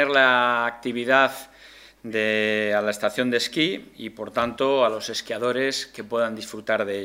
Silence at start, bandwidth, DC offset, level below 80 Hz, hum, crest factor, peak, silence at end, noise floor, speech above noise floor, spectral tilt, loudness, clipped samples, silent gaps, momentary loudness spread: 0 s; 16 kHz; under 0.1%; -64 dBFS; none; 22 dB; -2 dBFS; 0 s; -49 dBFS; 25 dB; -3.5 dB/octave; -23 LUFS; under 0.1%; none; 11 LU